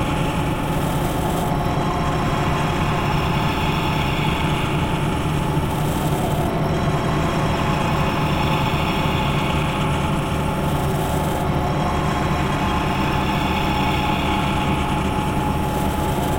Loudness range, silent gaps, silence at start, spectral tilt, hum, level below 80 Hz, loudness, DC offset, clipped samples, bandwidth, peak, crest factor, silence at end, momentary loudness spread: 1 LU; none; 0 s; -6 dB/octave; none; -30 dBFS; -21 LUFS; under 0.1%; under 0.1%; 16.5 kHz; -6 dBFS; 14 dB; 0 s; 2 LU